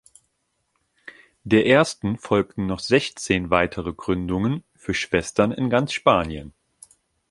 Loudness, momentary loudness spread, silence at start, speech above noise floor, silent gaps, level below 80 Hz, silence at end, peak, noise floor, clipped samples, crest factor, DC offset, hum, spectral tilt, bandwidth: -22 LUFS; 10 LU; 1.05 s; 51 dB; none; -46 dBFS; 0.8 s; -2 dBFS; -73 dBFS; under 0.1%; 22 dB; under 0.1%; none; -5.5 dB/octave; 11.5 kHz